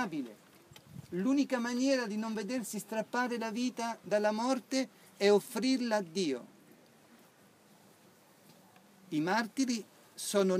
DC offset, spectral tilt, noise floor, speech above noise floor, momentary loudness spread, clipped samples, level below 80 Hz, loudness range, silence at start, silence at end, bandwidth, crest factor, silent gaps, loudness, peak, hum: under 0.1%; -4.5 dB/octave; -62 dBFS; 30 dB; 11 LU; under 0.1%; -84 dBFS; 8 LU; 0 s; 0 s; 15.5 kHz; 20 dB; none; -33 LUFS; -14 dBFS; none